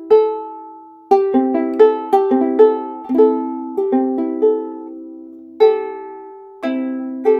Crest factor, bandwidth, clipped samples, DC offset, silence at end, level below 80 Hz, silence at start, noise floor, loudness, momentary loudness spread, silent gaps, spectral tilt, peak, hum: 16 dB; 5.2 kHz; under 0.1%; under 0.1%; 0 s; -66 dBFS; 0 s; -38 dBFS; -16 LUFS; 21 LU; none; -6.5 dB/octave; 0 dBFS; none